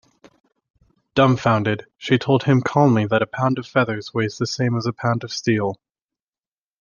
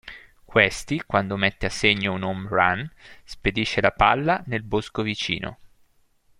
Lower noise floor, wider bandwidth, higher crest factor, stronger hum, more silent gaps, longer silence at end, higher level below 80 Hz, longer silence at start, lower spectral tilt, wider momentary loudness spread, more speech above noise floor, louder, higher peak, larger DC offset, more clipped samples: first, under -90 dBFS vs -61 dBFS; second, 7.2 kHz vs 15.5 kHz; about the same, 20 dB vs 22 dB; neither; neither; first, 1.05 s vs 0.75 s; second, -60 dBFS vs -44 dBFS; first, 1.15 s vs 0.05 s; first, -6.5 dB/octave vs -4.5 dB/octave; about the same, 8 LU vs 10 LU; first, over 71 dB vs 38 dB; first, -20 LUFS vs -23 LUFS; about the same, -2 dBFS vs -2 dBFS; neither; neither